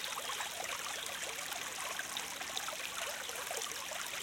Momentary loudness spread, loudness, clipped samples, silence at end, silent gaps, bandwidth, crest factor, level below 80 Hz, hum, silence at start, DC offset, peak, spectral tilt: 1 LU; -39 LUFS; under 0.1%; 0 s; none; 17 kHz; 20 dB; -74 dBFS; none; 0 s; under 0.1%; -20 dBFS; 0.5 dB/octave